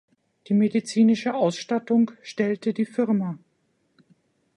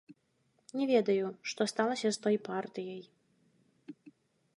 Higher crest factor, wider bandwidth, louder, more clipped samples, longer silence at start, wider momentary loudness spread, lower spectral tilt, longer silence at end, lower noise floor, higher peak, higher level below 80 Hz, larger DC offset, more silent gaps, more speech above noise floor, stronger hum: second, 14 dB vs 20 dB; about the same, 10.5 kHz vs 11.5 kHz; first, -24 LUFS vs -33 LUFS; neither; first, 0.5 s vs 0.1 s; second, 7 LU vs 21 LU; first, -6.5 dB/octave vs -4.5 dB/octave; first, 1.2 s vs 0.65 s; second, -69 dBFS vs -75 dBFS; first, -10 dBFS vs -14 dBFS; first, -74 dBFS vs -86 dBFS; neither; neither; first, 47 dB vs 42 dB; neither